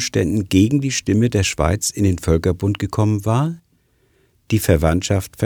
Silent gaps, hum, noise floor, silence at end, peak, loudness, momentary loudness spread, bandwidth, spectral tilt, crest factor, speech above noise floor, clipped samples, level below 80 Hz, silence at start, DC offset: none; none; -60 dBFS; 0 s; 0 dBFS; -18 LUFS; 5 LU; 19.5 kHz; -5.5 dB/octave; 18 dB; 43 dB; under 0.1%; -34 dBFS; 0 s; under 0.1%